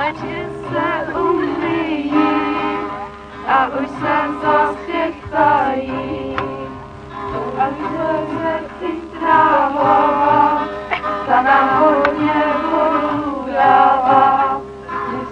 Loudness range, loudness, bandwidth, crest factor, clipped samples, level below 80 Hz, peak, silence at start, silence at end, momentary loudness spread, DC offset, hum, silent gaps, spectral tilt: 6 LU; -16 LUFS; 9.4 kHz; 16 dB; under 0.1%; -44 dBFS; 0 dBFS; 0 s; 0 s; 13 LU; under 0.1%; none; none; -7 dB/octave